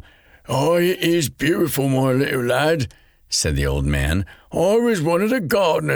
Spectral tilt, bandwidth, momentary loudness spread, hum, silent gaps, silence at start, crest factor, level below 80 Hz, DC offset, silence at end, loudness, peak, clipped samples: -5 dB/octave; over 20 kHz; 5 LU; none; none; 0.5 s; 14 dB; -34 dBFS; under 0.1%; 0 s; -19 LUFS; -4 dBFS; under 0.1%